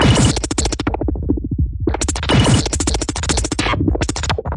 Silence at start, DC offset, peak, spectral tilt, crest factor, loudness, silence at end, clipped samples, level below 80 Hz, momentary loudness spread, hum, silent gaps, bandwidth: 0 s; under 0.1%; -2 dBFS; -4.5 dB/octave; 16 dB; -18 LUFS; 0 s; under 0.1%; -24 dBFS; 8 LU; none; none; 11.5 kHz